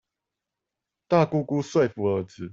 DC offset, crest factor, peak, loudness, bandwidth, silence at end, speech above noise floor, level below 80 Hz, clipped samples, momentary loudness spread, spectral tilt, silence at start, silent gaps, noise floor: under 0.1%; 20 dB; -6 dBFS; -24 LUFS; 7.8 kHz; 0 s; 62 dB; -66 dBFS; under 0.1%; 5 LU; -7.5 dB/octave; 1.1 s; none; -86 dBFS